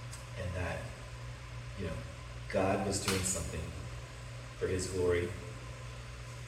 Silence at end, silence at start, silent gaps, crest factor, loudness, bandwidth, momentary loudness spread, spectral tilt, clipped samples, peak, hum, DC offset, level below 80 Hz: 0 s; 0 s; none; 20 dB; -37 LUFS; 16 kHz; 14 LU; -4.5 dB/octave; under 0.1%; -16 dBFS; none; under 0.1%; -50 dBFS